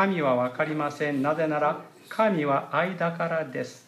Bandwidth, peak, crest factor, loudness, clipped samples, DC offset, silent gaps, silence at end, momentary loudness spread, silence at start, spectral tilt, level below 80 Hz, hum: 14 kHz; -10 dBFS; 16 dB; -26 LUFS; under 0.1%; under 0.1%; none; 0.1 s; 5 LU; 0 s; -7 dB/octave; -78 dBFS; none